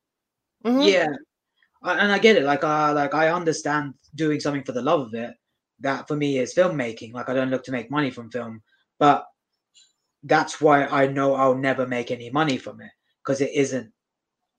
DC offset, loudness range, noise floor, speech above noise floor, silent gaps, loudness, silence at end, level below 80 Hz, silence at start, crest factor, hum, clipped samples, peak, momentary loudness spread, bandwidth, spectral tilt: under 0.1%; 5 LU; -83 dBFS; 62 dB; none; -22 LUFS; 0.7 s; -70 dBFS; 0.65 s; 22 dB; none; under 0.1%; -2 dBFS; 14 LU; 9.4 kHz; -5 dB/octave